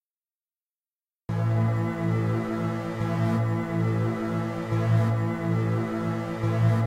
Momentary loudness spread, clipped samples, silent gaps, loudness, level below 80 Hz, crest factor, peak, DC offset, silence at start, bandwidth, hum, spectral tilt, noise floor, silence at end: 6 LU; under 0.1%; none; -27 LUFS; -54 dBFS; 14 dB; -12 dBFS; under 0.1%; 1.3 s; 9.2 kHz; none; -8.5 dB/octave; under -90 dBFS; 0 s